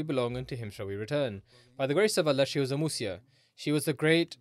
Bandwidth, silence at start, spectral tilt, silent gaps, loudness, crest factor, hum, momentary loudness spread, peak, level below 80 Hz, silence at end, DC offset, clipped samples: 15.5 kHz; 0 s; -5 dB/octave; none; -30 LUFS; 18 dB; none; 12 LU; -12 dBFS; -64 dBFS; 0.05 s; under 0.1%; under 0.1%